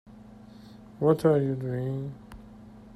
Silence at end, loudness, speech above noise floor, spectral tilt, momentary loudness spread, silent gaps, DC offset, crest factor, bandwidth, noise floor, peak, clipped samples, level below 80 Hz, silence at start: 0 s; -27 LUFS; 23 dB; -9 dB/octave; 26 LU; none; under 0.1%; 20 dB; 14 kHz; -49 dBFS; -8 dBFS; under 0.1%; -56 dBFS; 0.05 s